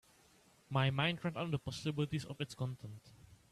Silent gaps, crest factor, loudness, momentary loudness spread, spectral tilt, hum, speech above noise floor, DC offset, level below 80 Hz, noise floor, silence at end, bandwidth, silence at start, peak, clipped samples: none; 18 dB; -38 LUFS; 13 LU; -6 dB/octave; none; 29 dB; under 0.1%; -68 dBFS; -67 dBFS; 0.15 s; 13 kHz; 0.7 s; -22 dBFS; under 0.1%